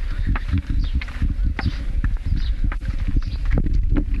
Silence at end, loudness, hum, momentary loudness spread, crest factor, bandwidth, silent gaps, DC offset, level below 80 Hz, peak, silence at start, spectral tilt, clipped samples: 0 s; -25 LUFS; none; 4 LU; 14 dB; 6 kHz; none; under 0.1%; -20 dBFS; -6 dBFS; 0 s; -7.5 dB/octave; under 0.1%